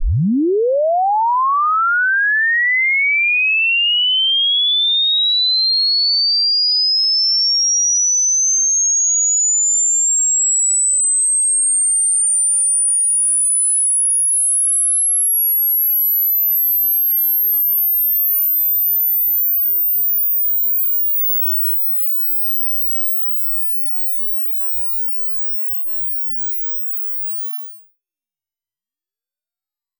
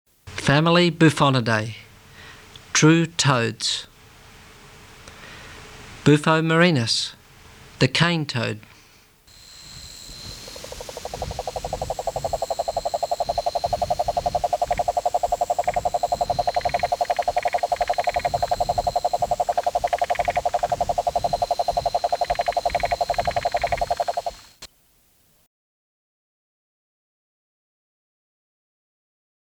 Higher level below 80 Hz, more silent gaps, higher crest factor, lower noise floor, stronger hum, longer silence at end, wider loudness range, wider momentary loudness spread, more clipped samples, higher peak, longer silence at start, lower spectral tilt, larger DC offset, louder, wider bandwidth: first, -40 dBFS vs -46 dBFS; neither; second, 4 dB vs 20 dB; first, under -90 dBFS vs -60 dBFS; neither; second, 2.2 s vs 4.8 s; second, 3 LU vs 9 LU; second, 3 LU vs 20 LU; neither; second, -12 dBFS vs -4 dBFS; second, 0 s vs 0.25 s; second, 0 dB/octave vs -4.5 dB/octave; neither; first, -13 LUFS vs -22 LUFS; about the same, over 20 kHz vs 20 kHz